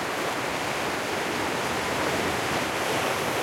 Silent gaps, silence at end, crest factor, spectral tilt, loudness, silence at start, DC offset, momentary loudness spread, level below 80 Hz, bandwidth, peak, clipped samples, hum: none; 0 s; 14 dB; -3 dB/octave; -27 LUFS; 0 s; under 0.1%; 2 LU; -54 dBFS; 16.5 kHz; -14 dBFS; under 0.1%; none